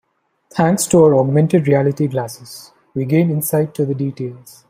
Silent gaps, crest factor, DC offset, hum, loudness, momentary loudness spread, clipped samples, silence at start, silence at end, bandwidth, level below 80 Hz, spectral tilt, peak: none; 14 dB; under 0.1%; none; -16 LUFS; 17 LU; under 0.1%; 0.55 s; 0.2 s; 16 kHz; -56 dBFS; -6.5 dB/octave; -2 dBFS